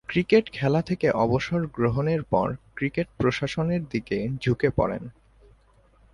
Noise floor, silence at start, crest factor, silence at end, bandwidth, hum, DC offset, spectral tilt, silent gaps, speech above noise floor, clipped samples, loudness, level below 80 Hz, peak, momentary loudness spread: -58 dBFS; 0.1 s; 18 dB; 1 s; 11 kHz; none; under 0.1%; -7.5 dB/octave; none; 34 dB; under 0.1%; -25 LUFS; -48 dBFS; -6 dBFS; 7 LU